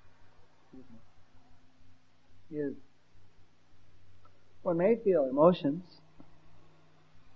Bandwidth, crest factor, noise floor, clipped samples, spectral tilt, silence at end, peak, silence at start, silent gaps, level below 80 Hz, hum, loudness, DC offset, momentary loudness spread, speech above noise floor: 6 kHz; 26 dB; -62 dBFS; under 0.1%; -9.5 dB/octave; 1.55 s; -10 dBFS; 0.75 s; none; -68 dBFS; none; -29 LUFS; 0.3%; 16 LU; 33 dB